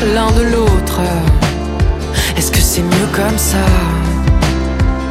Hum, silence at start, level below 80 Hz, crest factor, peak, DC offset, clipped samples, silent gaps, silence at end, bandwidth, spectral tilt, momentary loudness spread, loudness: none; 0 s; -16 dBFS; 12 dB; 0 dBFS; under 0.1%; under 0.1%; none; 0 s; 16.5 kHz; -5 dB/octave; 4 LU; -13 LUFS